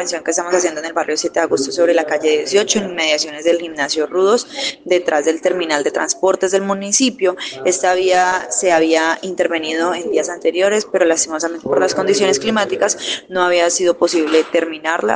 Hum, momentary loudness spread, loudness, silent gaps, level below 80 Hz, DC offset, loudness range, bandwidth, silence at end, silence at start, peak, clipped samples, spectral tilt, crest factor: none; 5 LU; -16 LUFS; none; -60 dBFS; under 0.1%; 1 LU; 10.5 kHz; 0 s; 0 s; -2 dBFS; under 0.1%; -2 dB/octave; 16 dB